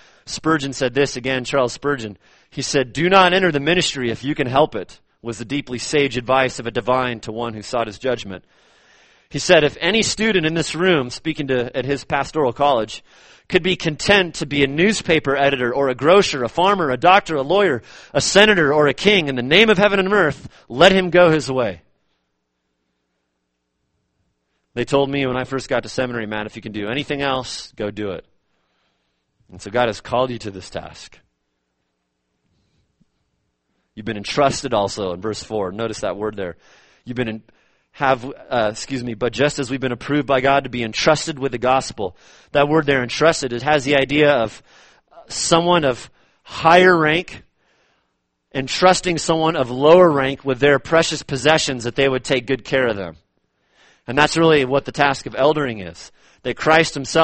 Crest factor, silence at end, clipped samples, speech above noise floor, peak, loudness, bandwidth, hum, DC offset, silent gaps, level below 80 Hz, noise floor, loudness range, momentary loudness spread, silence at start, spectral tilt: 20 dB; 0 s; under 0.1%; 55 dB; 0 dBFS; -18 LUFS; 8.8 kHz; none; under 0.1%; none; -48 dBFS; -73 dBFS; 10 LU; 15 LU; 0.25 s; -4 dB/octave